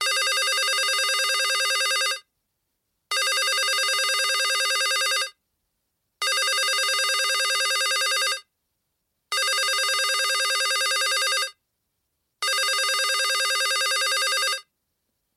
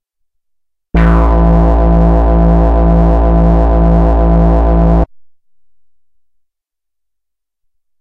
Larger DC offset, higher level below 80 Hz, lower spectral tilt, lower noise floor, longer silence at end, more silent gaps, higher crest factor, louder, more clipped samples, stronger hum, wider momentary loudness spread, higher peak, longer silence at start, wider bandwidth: neither; second, -86 dBFS vs -12 dBFS; second, 5.5 dB/octave vs -10.5 dB/octave; about the same, -77 dBFS vs -80 dBFS; second, 0.75 s vs 2.95 s; neither; about the same, 14 dB vs 10 dB; second, -21 LUFS vs -10 LUFS; neither; neither; first, 5 LU vs 2 LU; second, -10 dBFS vs 0 dBFS; second, 0 s vs 0.95 s; first, 16.5 kHz vs 3.7 kHz